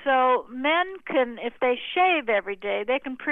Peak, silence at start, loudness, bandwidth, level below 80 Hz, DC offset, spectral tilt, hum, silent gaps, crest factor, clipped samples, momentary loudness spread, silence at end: -10 dBFS; 0 s; -24 LUFS; 4 kHz; -64 dBFS; under 0.1%; -6 dB/octave; none; none; 14 dB; under 0.1%; 7 LU; 0 s